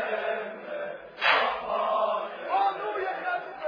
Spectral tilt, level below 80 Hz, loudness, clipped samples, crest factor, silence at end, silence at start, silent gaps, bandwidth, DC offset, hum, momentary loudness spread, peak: -4 dB/octave; -70 dBFS; -28 LUFS; under 0.1%; 22 dB; 0 s; 0 s; none; 5.2 kHz; under 0.1%; none; 13 LU; -8 dBFS